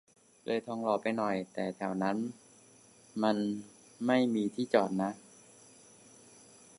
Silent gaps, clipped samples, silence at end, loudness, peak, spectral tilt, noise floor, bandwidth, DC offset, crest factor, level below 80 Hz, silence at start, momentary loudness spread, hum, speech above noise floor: none; under 0.1%; 1.6 s; -33 LUFS; -12 dBFS; -6 dB/octave; -60 dBFS; 11.5 kHz; under 0.1%; 22 dB; -78 dBFS; 0.45 s; 14 LU; none; 28 dB